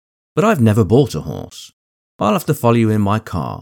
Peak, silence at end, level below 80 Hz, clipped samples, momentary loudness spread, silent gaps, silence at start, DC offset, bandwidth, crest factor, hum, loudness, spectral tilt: -2 dBFS; 0.05 s; -46 dBFS; under 0.1%; 15 LU; 1.73-2.19 s; 0.35 s; under 0.1%; 19 kHz; 16 dB; none; -16 LUFS; -7 dB/octave